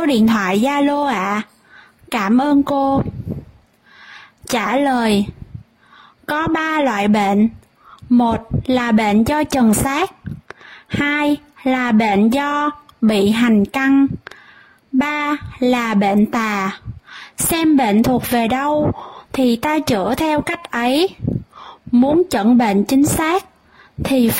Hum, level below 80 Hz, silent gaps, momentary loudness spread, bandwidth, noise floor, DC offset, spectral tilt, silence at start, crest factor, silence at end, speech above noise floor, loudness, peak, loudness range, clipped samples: none; -42 dBFS; none; 12 LU; 16.5 kHz; -49 dBFS; under 0.1%; -5 dB/octave; 0 s; 12 dB; 0 s; 33 dB; -17 LUFS; -4 dBFS; 3 LU; under 0.1%